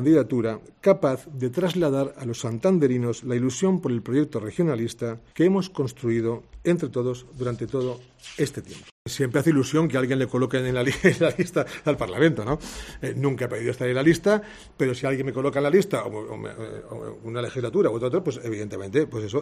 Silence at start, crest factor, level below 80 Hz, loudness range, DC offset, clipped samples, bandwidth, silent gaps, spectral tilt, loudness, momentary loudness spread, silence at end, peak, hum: 0 s; 20 dB; -52 dBFS; 4 LU; under 0.1%; under 0.1%; 14.5 kHz; 8.91-9.05 s; -6.5 dB/octave; -24 LUFS; 12 LU; 0 s; -4 dBFS; none